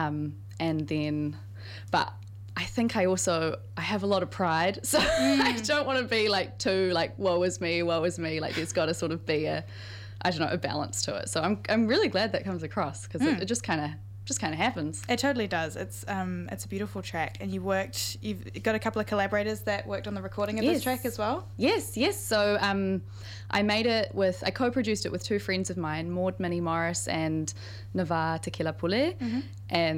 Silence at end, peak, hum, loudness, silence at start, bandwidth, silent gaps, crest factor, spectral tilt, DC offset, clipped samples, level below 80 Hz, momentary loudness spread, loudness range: 0 s; -8 dBFS; none; -29 LUFS; 0 s; 16 kHz; none; 20 dB; -4.5 dB/octave; under 0.1%; under 0.1%; -54 dBFS; 9 LU; 5 LU